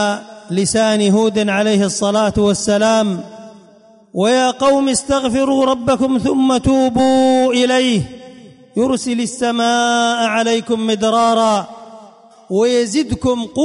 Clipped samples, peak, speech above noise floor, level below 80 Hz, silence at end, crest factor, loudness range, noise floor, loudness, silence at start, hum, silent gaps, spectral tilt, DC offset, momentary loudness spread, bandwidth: under 0.1%; -4 dBFS; 32 dB; -42 dBFS; 0 s; 12 dB; 2 LU; -46 dBFS; -15 LUFS; 0 s; none; none; -4.5 dB/octave; under 0.1%; 7 LU; 11 kHz